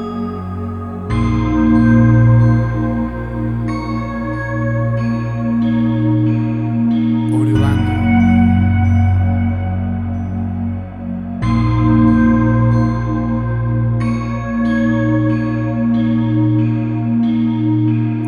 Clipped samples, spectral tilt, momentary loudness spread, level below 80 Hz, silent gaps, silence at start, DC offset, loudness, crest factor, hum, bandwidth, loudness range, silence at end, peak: under 0.1%; -9.5 dB/octave; 10 LU; -30 dBFS; none; 0 s; under 0.1%; -16 LUFS; 14 dB; none; 6.6 kHz; 3 LU; 0 s; 0 dBFS